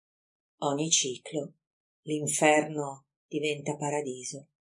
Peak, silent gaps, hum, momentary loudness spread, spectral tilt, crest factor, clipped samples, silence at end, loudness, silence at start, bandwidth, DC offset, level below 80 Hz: -8 dBFS; 1.67-2.03 s, 3.16-3.29 s; none; 16 LU; -3 dB/octave; 24 dB; under 0.1%; 0.2 s; -29 LUFS; 0.6 s; 11.5 kHz; under 0.1%; -84 dBFS